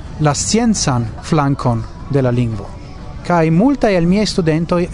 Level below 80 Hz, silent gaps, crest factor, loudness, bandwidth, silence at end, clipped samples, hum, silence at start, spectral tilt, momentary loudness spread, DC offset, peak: -32 dBFS; none; 16 dB; -15 LUFS; 11 kHz; 0 s; under 0.1%; none; 0 s; -5.5 dB/octave; 12 LU; under 0.1%; 0 dBFS